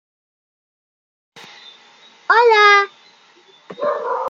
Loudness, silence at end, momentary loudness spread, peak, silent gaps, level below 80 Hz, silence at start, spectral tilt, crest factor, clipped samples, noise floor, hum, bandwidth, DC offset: -14 LUFS; 0 s; 16 LU; -2 dBFS; none; -80 dBFS; 2.3 s; -1 dB/octave; 18 dB; under 0.1%; -50 dBFS; none; 7.6 kHz; under 0.1%